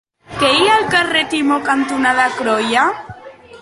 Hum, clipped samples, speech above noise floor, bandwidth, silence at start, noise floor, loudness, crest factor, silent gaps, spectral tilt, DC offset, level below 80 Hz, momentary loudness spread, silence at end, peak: none; under 0.1%; 21 dB; 11.5 kHz; 0.3 s; -37 dBFS; -14 LUFS; 14 dB; none; -3 dB/octave; under 0.1%; -52 dBFS; 6 LU; 0.05 s; -2 dBFS